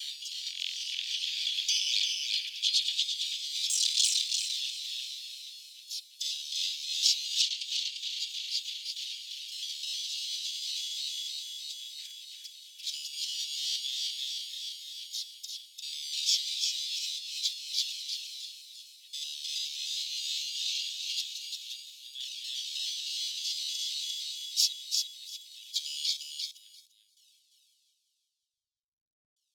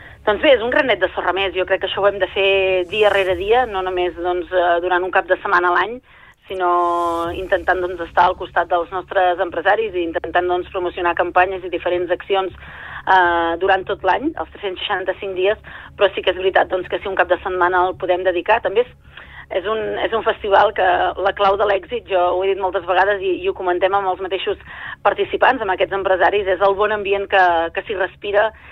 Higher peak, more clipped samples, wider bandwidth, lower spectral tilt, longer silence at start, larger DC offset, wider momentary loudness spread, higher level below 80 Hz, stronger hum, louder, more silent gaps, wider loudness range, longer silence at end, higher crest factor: second, -10 dBFS vs -2 dBFS; neither; first, 19.5 kHz vs 9.8 kHz; second, 12.5 dB/octave vs -5.5 dB/octave; about the same, 0 s vs 0 s; neither; first, 13 LU vs 8 LU; second, under -90 dBFS vs -44 dBFS; neither; second, -31 LUFS vs -18 LUFS; neither; first, 7 LU vs 2 LU; first, 2.7 s vs 0 s; first, 24 dB vs 16 dB